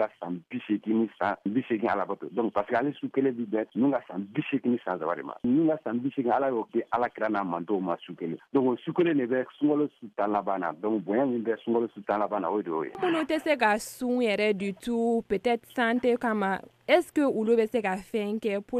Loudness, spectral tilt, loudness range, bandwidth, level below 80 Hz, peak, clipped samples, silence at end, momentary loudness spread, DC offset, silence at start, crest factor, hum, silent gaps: -28 LUFS; -6 dB/octave; 2 LU; 14.5 kHz; -68 dBFS; -10 dBFS; under 0.1%; 0 s; 6 LU; under 0.1%; 0 s; 18 dB; none; none